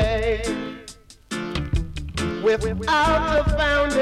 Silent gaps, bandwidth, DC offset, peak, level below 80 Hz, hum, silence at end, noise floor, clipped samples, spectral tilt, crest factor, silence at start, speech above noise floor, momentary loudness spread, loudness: none; 13.5 kHz; under 0.1%; -10 dBFS; -30 dBFS; none; 0 s; -45 dBFS; under 0.1%; -5 dB/octave; 12 dB; 0 s; 25 dB; 13 LU; -22 LUFS